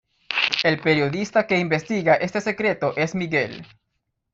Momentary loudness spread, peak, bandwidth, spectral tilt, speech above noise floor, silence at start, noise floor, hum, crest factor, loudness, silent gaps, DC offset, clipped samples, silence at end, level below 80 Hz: 5 LU; 0 dBFS; 8 kHz; -5 dB/octave; 54 dB; 0.3 s; -76 dBFS; none; 22 dB; -21 LUFS; none; under 0.1%; under 0.1%; 0.7 s; -60 dBFS